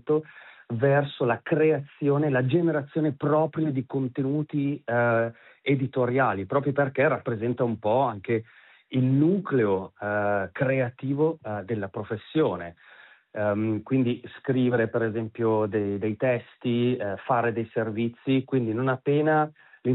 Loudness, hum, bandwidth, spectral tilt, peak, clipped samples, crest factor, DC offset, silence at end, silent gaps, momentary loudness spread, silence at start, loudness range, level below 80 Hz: -26 LUFS; none; 4.1 kHz; -6.5 dB/octave; -8 dBFS; under 0.1%; 16 dB; under 0.1%; 0 s; none; 7 LU; 0.05 s; 3 LU; -72 dBFS